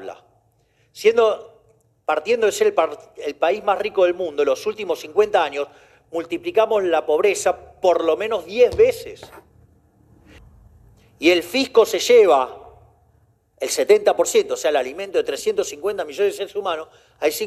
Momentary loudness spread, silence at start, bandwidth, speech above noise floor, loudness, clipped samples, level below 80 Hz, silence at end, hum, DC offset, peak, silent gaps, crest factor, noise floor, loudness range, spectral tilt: 13 LU; 0 s; 14.5 kHz; 42 dB; -19 LUFS; under 0.1%; -56 dBFS; 0 s; none; under 0.1%; -2 dBFS; none; 18 dB; -61 dBFS; 4 LU; -2.5 dB/octave